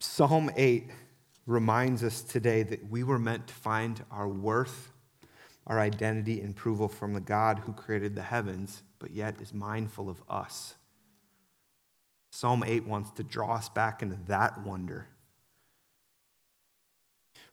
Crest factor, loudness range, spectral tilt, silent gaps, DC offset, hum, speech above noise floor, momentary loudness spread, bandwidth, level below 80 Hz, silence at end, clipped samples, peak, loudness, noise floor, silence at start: 22 dB; 7 LU; -6 dB/octave; none; under 0.1%; none; 43 dB; 14 LU; 17 kHz; -68 dBFS; 0.1 s; under 0.1%; -10 dBFS; -31 LUFS; -73 dBFS; 0 s